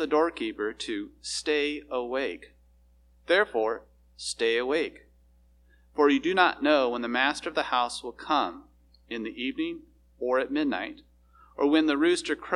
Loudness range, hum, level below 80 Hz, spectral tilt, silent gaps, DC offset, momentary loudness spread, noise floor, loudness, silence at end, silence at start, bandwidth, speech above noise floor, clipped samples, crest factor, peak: 5 LU; none; -60 dBFS; -3 dB/octave; none; under 0.1%; 13 LU; -60 dBFS; -27 LUFS; 0 s; 0 s; 11.5 kHz; 33 dB; under 0.1%; 24 dB; -6 dBFS